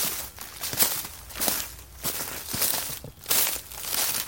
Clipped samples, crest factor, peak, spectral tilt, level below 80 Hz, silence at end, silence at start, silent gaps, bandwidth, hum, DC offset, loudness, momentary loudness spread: under 0.1%; 28 dB; -2 dBFS; -0.5 dB/octave; -52 dBFS; 0 s; 0 s; none; 17 kHz; none; under 0.1%; -26 LUFS; 12 LU